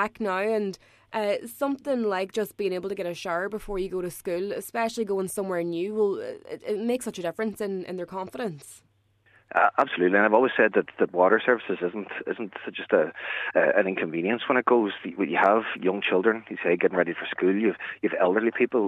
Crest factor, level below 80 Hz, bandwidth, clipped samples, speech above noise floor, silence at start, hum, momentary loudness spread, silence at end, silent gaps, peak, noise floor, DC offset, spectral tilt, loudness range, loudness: 20 dB; -58 dBFS; 14 kHz; under 0.1%; 37 dB; 0 s; none; 12 LU; 0 s; none; -6 dBFS; -63 dBFS; under 0.1%; -5 dB/octave; 7 LU; -26 LUFS